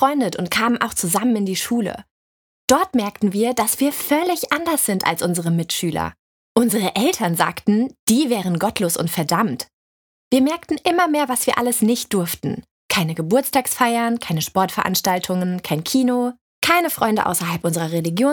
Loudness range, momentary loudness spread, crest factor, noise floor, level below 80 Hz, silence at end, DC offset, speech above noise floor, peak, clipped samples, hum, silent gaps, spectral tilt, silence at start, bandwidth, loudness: 1 LU; 5 LU; 20 dB; under -90 dBFS; -56 dBFS; 0 s; under 0.1%; over 71 dB; 0 dBFS; under 0.1%; none; 2.11-2.68 s, 6.19-6.55 s, 7.99-8.07 s, 9.73-10.31 s, 12.71-12.89 s, 16.41-16.62 s; -4 dB/octave; 0 s; over 20 kHz; -19 LUFS